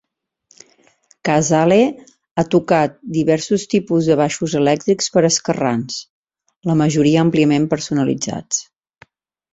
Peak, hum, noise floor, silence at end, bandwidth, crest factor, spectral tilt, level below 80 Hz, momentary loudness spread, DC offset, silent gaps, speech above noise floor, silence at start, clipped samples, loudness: -2 dBFS; none; -59 dBFS; 0.9 s; 8 kHz; 16 dB; -5 dB/octave; -54 dBFS; 9 LU; under 0.1%; 2.31-2.36 s, 6.10-6.23 s; 43 dB; 1.25 s; under 0.1%; -17 LUFS